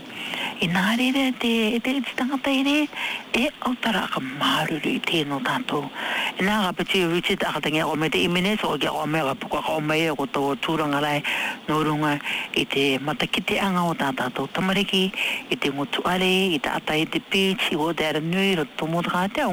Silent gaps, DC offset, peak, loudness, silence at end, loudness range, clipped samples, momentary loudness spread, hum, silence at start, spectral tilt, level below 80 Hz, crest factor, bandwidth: none; under 0.1%; -12 dBFS; -23 LUFS; 0 s; 1 LU; under 0.1%; 5 LU; none; 0 s; -4.5 dB/octave; -56 dBFS; 12 dB; 19.5 kHz